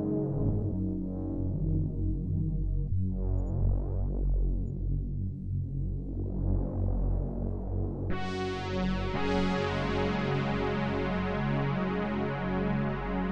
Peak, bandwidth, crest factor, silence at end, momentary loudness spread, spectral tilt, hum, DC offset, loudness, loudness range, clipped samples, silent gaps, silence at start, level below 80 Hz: -16 dBFS; 7.2 kHz; 14 dB; 0 s; 5 LU; -8 dB/octave; none; under 0.1%; -32 LUFS; 3 LU; under 0.1%; none; 0 s; -36 dBFS